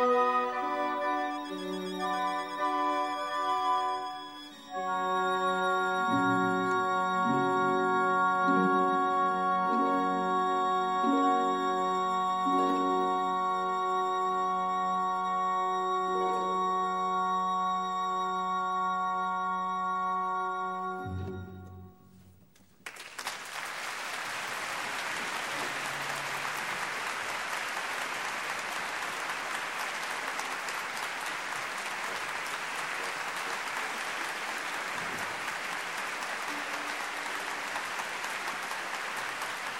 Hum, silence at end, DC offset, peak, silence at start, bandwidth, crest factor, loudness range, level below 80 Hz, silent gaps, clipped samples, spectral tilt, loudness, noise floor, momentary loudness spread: none; 0 s; under 0.1%; -14 dBFS; 0 s; 16 kHz; 16 dB; 7 LU; -72 dBFS; none; under 0.1%; -3.5 dB/octave; -31 LUFS; -61 dBFS; 7 LU